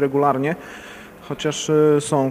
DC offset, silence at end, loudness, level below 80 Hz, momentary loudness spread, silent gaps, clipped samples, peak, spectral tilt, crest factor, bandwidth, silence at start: under 0.1%; 0 s; -19 LUFS; -56 dBFS; 21 LU; none; under 0.1%; -4 dBFS; -5.5 dB/octave; 16 dB; 15.5 kHz; 0 s